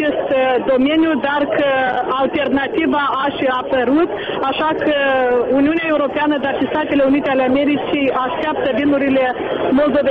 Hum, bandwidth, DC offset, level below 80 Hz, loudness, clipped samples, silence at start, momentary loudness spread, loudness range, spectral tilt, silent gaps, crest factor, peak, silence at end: none; 5 kHz; under 0.1%; -48 dBFS; -16 LUFS; under 0.1%; 0 s; 4 LU; 1 LU; -7.5 dB/octave; none; 10 dB; -6 dBFS; 0 s